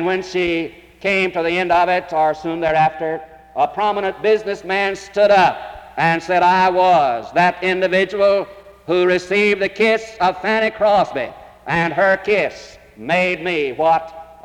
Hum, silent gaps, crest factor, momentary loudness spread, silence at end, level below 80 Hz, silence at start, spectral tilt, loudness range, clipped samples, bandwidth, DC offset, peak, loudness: none; none; 14 dB; 11 LU; 0.2 s; -50 dBFS; 0 s; -5.5 dB/octave; 3 LU; under 0.1%; 12 kHz; under 0.1%; -4 dBFS; -17 LUFS